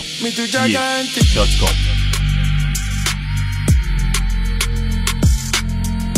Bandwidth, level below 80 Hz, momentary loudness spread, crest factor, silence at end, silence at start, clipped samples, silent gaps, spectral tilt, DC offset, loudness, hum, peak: 15.5 kHz; -18 dBFS; 5 LU; 16 dB; 0 s; 0 s; under 0.1%; none; -4 dB/octave; under 0.1%; -18 LUFS; none; -2 dBFS